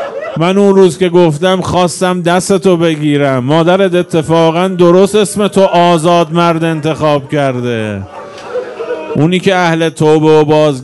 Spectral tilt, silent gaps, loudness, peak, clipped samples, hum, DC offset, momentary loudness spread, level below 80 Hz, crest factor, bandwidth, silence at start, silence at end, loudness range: -6 dB/octave; none; -10 LUFS; 0 dBFS; 0.8%; none; under 0.1%; 11 LU; -46 dBFS; 10 dB; 12 kHz; 0 s; 0 s; 4 LU